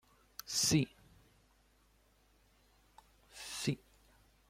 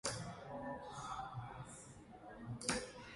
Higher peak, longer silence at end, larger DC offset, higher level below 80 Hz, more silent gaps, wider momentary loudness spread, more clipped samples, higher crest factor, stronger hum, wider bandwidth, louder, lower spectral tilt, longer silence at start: about the same, -18 dBFS vs -20 dBFS; first, 0.75 s vs 0 s; neither; about the same, -66 dBFS vs -66 dBFS; neither; first, 21 LU vs 15 LU; neither; about the same, 24 dB vs 28 dB; neither; first, 16.5 kHz vs 11.5 kHz; first, -35 LUFS vs -46 LUFS; about the same, -3.5 dB/octave vs -3.5 dB/octave; first, 0.45 s vs 0.05 s